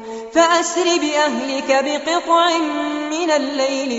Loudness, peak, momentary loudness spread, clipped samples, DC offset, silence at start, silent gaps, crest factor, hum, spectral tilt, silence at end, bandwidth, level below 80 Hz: -17 LUFS; -2 dBFS; 6 LU; under 0.1%; under 0.1%; 0 s; none; 16 dB; none; -1 dB/octave; 0 s; 8.2 kHz; -60 dBFS